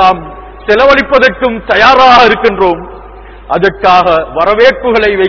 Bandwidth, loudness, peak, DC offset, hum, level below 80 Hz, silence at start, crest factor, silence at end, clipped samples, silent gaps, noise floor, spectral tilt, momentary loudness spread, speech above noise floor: 5.4 kHz; -7 LUFS; 0 dBFS; under 0.1%; none; -32 dBFS; 0 s; 8 dB; 0 s; 7%; none; -30 dBFS; -5 dB/octave; 14 LU; 22 dB